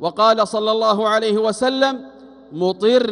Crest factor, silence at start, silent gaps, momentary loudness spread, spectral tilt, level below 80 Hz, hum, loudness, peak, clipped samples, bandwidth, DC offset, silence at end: 16 dB; 0 s; none; 7 LU; -4.5 dB/octave; -62 dBFS; none; -17 LUFS; -2 dBFS; under 0.1%; 11 kHz; under 0.1%; 0 s